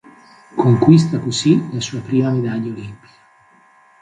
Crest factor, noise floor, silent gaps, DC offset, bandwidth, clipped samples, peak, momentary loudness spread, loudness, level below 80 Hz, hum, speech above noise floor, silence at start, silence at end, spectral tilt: 18 dB; -51 dBFS; none; under 0.1%; 9.4 kHz; under 0.1%; 0 dBFS; 16 LU; -16 LUFS; -54 dBFS; none; 35 dB; 0.55 s; 1.05 s; -6.5 dB/octave